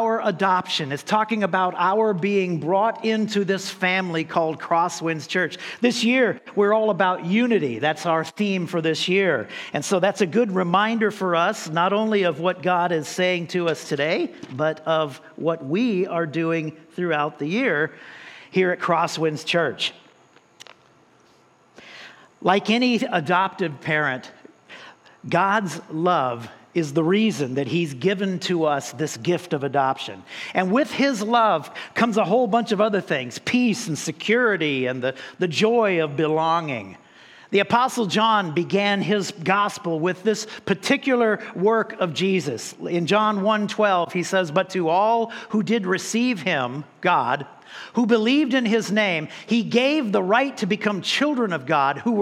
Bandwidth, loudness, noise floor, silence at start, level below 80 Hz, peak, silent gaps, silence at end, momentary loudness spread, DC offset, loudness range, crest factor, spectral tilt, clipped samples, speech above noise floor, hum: 14 kHz; -22 LUFS; -56 dBFS; 0 s; -74 dBFS; -4 dBFS; none; 0 s; 8 LU; under 0.1%; 3 LU; 18 dB; -5 dB/octave; under 0.1%; 35 dB; none